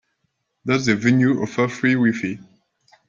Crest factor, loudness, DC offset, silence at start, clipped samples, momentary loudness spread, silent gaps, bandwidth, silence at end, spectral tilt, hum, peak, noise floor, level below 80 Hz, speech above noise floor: 18 dB; -19 LUFS; under 0.1%; 0.65 s; under 0.1%; 12 LU; none; 7.6 kHz; 0.65 s; -6 dB/octave; none; -2 dBFS; -73 dBFS; -60 dBFS; 54 dB